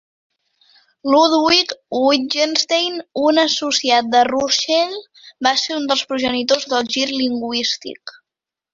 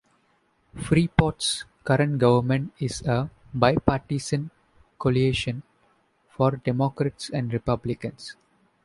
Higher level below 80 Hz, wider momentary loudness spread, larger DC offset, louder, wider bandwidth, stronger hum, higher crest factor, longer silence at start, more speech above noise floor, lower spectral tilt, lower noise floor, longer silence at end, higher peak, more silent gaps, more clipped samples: second, -60 dBFS vs -46 dBFS; second, 8 LU vs 12 LU; neither; first, -17 LUFS vs -25 LUFS; second, 7.8 kHz vs 11.5 kHz; neither; second, 18 dB vs 24 dB; first, 1.05 s vs 0.75 s; first, 69 dB vs 43 dB; second, -1.5 dB/octave vs -6 dB/octave; first, -87 dBFS vs -66 dBFS; about the same, 0.65 s vs 0.55 s; about the same, -2 dBFS vs -2 dBFS; neither; neither